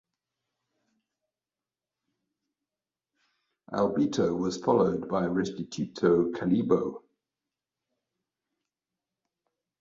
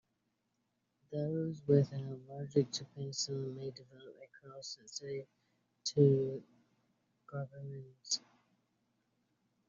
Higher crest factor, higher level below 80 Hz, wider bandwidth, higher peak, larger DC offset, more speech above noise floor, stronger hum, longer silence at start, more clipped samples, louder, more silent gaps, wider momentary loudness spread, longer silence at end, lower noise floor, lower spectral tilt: about the same, 22 dB vs 24 dB; first, -64 dBFS vs -76 dBFS; about the same, 7.8 kHz vs 7.4 kHz; first, -10 dBFS vs -14 dBFS; neither; first, over 63 dB vs 46 dB; neither; first, 3.7 s vs 1.1 s; neither; first, -28 LUFS vs -36 LUFS; neither; second, 10 LU vs 20 LU; first, 2.85 s vs 1.5 s; first, under -90 dBFS vs -83 dBFS; about the same, -7 dB/octave vs -7.5 dB/octave